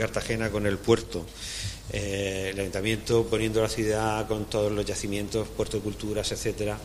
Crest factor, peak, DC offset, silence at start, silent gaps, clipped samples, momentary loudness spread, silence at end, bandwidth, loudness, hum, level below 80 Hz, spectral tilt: 22 dB; -6 dBFS; under 0.1%; 0 s; none; under 0.1%; 8 LU; 0 s; 15.5 kHz; -28 LUFS; none; -44 dBFS; -4.5 dB/octave